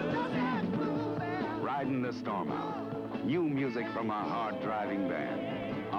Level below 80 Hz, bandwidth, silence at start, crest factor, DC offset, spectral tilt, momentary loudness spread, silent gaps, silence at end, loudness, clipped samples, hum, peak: -66 dBFS; 7.6 kHz; 0 s; 12 dB; under 0.1%; -8 dB/octave; 4 LU; none; 0 s; -34 LUFS; under 0.1%; none; -20 dBFS